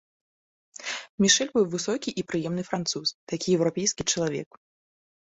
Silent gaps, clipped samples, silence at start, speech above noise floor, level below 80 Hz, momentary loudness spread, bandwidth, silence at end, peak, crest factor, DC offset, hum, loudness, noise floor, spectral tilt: 1.09-1.18 s, 3.14-3.27 s; under 0.1%; 0.8 s; over 64 dB; -62 dBFS; 13 LU; 8.4 kHz; 0.95 s; -6 dBFS; 22 dB; under 0.1%; none; -26 LUFS; under -90 dBFS; -3 dB/octave